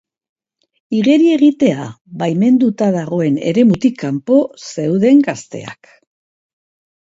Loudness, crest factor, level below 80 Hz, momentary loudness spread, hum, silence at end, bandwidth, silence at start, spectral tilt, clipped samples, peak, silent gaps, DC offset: -14 LUFS; 14 dB; -58 dBFS; 14 LU; none; 1.3 s; 8 kHz; 0.9 s; -7 dB/octave; under 0.1%; 0 dBFS; 2.01-2.05 s; under 0.1%